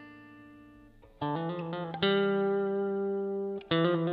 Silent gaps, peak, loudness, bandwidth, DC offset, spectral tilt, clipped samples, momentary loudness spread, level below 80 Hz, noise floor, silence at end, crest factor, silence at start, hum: none; -12 dBFS; -31 LUFS; 4.9 kHz; under 0.1%; -9 dB/octave; under 0.1%; 9 LU; -66 dBFS; -56 dBFS; 0 s; 20 dB; 0 s; none